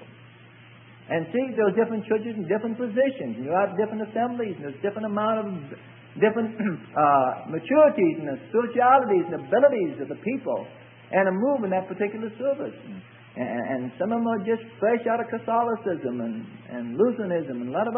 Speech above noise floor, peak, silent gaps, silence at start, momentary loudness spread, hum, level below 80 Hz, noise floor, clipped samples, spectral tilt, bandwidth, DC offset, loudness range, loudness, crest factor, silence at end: 25 dB; -6 dBFS; none; 0 s; 13 LU; none; -74 dBFS; -49 dBFS; under 0.1%; -11 dB/octave; 3.6 kHz; under 0.1%; 6 LU; -25 LUFS; 20 dB; 0 s